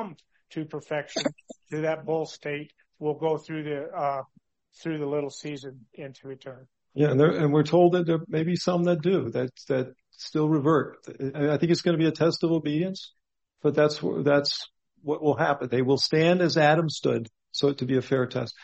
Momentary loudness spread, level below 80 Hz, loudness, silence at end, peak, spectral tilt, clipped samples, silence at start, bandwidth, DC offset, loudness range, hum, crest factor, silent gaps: 17 LU; -68 dBFS; -26 LUFS; 0.15 s; -8 dBFS; -6.5 dB/octave; under 0.1%; 0 s; 8.2 kHz; under 0.1%; 8 LU; none; 18 dB; none